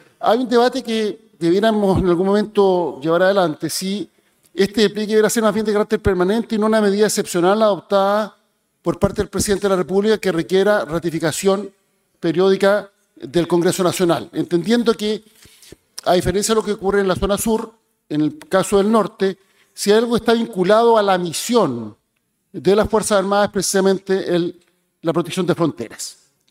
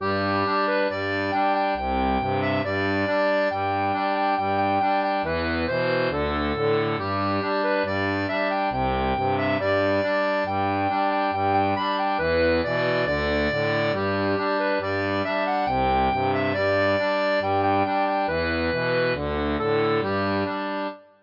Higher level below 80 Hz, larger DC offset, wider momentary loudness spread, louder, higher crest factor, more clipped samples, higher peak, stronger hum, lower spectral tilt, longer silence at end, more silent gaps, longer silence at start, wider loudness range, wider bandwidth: about the same, -44 dBFS vs -44 dBFS; neither; first, 10 LU vs 3 LU; first, -18 LUFS vs -23 LUFS; about the same, 18 dB vs 14 dB; neither; first, 0 dBFS vs -10 dBFS; neither; second, -5 dB/octave vs -7.5 dB/octave; first, 0.4 s vs 0.2 s; neither; first, 0.2 s vs 0 s; about the same, 3 LU vs 1 LU; first, 16 kHz vs 5.6 kHz